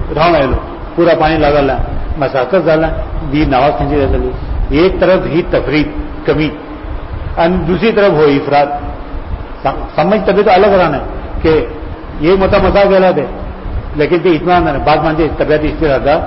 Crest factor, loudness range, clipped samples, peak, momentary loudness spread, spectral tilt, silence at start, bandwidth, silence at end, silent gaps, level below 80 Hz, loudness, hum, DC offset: 10 dB; 2 LU; under 0.1%; 0 dBFS; 14 LU; -11 dB/octave; 0 s; 5.8 kHz; 0 s; none; -22 dBFS; -12 LUFS; none; under 0.1%